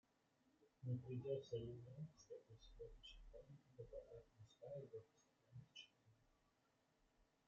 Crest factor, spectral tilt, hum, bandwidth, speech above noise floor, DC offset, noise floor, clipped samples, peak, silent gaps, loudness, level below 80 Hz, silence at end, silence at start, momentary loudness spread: 20 dB; -7 dB/octave; none; 7.4 kHz; 29 dB; under 0.1%; -83 dBFS; under 0.1%; -36 dBFS; none; -56 LUFS; -72 dBFS; 0.25 s; 0.6 s; 16 LU